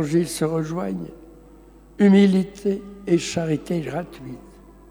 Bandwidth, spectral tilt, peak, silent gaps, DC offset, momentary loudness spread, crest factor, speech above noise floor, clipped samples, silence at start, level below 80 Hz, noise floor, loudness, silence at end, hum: 14 kHz; -6.5 dB/octave; -6 dBFS; none; under 0.1%; 21 LU; 16 dB; 26 dB; under 0.1%; 0 s; -50 dBFS; -47 dBFS; -22 LUFS; 0.45 s; none